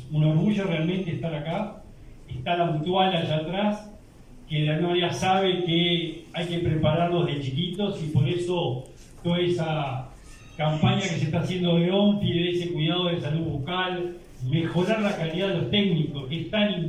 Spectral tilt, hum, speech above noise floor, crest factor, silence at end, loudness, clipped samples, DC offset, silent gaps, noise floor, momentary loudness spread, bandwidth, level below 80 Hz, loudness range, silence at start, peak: -6.5 dB/octave; none; 22 dB; 16 dB; 0 s; -25 LUFS; under 0.1%; under 0.1%; none; -47 dBFS; 9 LU; 10.5 kHz; -50 dBFS; 3 LU; 0 s; -10 dBFS